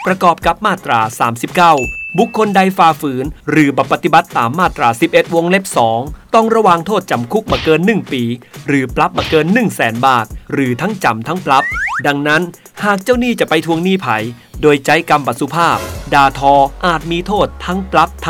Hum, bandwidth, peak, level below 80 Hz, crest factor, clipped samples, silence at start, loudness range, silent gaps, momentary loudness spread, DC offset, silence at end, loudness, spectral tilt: none; 19 kHz; 0 dBFS; -36 dBFS; 14 dB; 0.2%; 0 s; 2 LU; none; 7 LU; under 0.1%; 0 s; -13 LUFS; -5 dB/octave